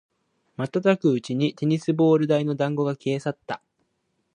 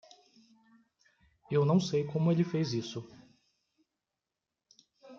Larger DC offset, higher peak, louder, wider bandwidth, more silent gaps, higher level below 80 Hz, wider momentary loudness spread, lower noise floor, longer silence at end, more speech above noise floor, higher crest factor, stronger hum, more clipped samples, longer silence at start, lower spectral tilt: neither; first, -6 dBFS vs -16 dBFS; first, -23 LUFS vs -30 LUFS; first, 10 kHz vs 7.4 kHz; neither; about the same, -72 dBFS vs -74 dBFS; about the same, 14 LU vs 15 LU; second, -73 dBFS vs -89 dBFS; first, 0.8 s vs 0 s; second, 51 dB vs 60 dB; about the same, 18 dB vs 18 dB; neither; neither; second, 0.6 s vs 1.5 s; about the same, -7.5 dB/octave vs -7 dB/octave